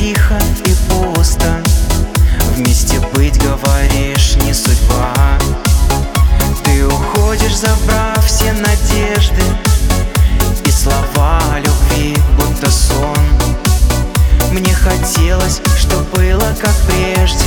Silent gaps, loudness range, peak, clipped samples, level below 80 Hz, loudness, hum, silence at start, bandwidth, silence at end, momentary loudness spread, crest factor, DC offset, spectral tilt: none; 0 LU; 0 dBFS; under 0.1%; -12 dBFS; -12 LUFS; none; 0 s; over 20 kHz; 0 s; 1 LU; 10 dB; under 0.1%; -4.5 dB/octave